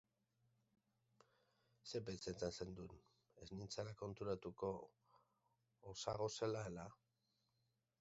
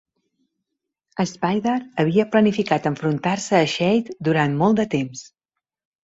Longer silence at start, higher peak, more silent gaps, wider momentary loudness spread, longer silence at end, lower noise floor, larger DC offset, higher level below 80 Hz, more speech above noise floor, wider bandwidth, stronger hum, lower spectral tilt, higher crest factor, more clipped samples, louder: first, 1.85 s vs 1.15 s; second, -28 dBFS vs -2 dBFS; neither; first, 15 LU vs 8 LU; first, 1.05 s vs 0.75 s; about the same, -87 dBFS vs -84 dBFS; neither; second, -72 dBFS vs -60 dBFS; second, 38 dB vs 64 dB; about the same, 7.6 kHz vs 8 kHz; neither; about the same, -5 dB/octave vs -6 dB/octave; first, 24 dB vs 18 dB; neither; second, -49 LUFS vs -20 LUFS